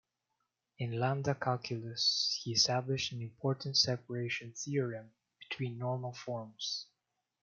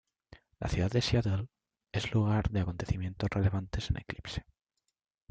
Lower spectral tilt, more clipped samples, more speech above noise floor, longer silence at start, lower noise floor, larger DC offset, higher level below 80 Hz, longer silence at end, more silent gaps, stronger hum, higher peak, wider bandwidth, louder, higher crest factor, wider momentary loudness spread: second, -3.5 dB/octave vs -6.5 dB/octave; neither; about the same, 50 dB vs 53 dB; first, 0.8 s vs 0.6 s; about the same, -86 dBFS vs -84 dBFS; neither; second, -74 dBFS vs -46 dBFS; second, 0.6 s vs 0.9 s; neither; neither; about the same, -14 dBFS vs -14 dBFS; second, 7.4 kHz vs 8.8 kHz; about the same, -34 LUFS vs -33 LUFS; about the same, 22 dB vs 18 dB; about the same, 11 LU vs 11 LU